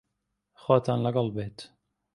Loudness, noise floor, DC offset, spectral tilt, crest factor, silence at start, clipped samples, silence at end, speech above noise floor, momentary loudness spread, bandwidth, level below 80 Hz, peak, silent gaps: -27 LUFS; -81 dBFS; under 0.1%; -8 dB/octave; 24 dB; 0.65 s; under 0.1%; 0.5 s; 55 dB; 16 LU; 11.5 kHz; -62 dBFS; -6 dBFS; none